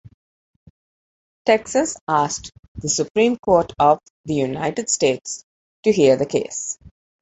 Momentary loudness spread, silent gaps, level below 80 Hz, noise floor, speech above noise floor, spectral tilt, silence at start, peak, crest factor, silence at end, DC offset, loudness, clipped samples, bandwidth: 13 LU; 2.01-2.07 s, 2.59-2.75 s, 3.10-3.15 s, 3.39-3.43 s, 4.10-4.24 s, 5.43-5.83 s; -52 dBFS; under -90 dBFS; over 71 dB; -4 dB/octave; 1.45 s; -2 dBFS; 20 dB; 0.35 s; under 0.1%; -20 LUFS; under 0.1%; 8.2 kHz